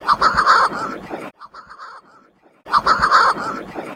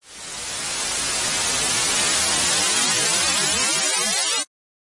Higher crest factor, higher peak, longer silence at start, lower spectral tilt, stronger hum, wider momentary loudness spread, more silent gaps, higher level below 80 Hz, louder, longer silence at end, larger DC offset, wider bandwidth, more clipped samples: about the same, 16 dB vs 16 dB; first, -2 dBFS vs -6 dBFS; about the same, 0 s vs 0.05 s; first, -3 dB/octave vs 0.5 dB/octave; neither; first, 23 LU vs 8 LU; neither; first, -46 dBFS vs -52 dBFS; first, -16 LUFS vs -19 LUFS; second, 0 s vs 0.4 s; neither; first, 15 kHz vs 11.5 kHz; neither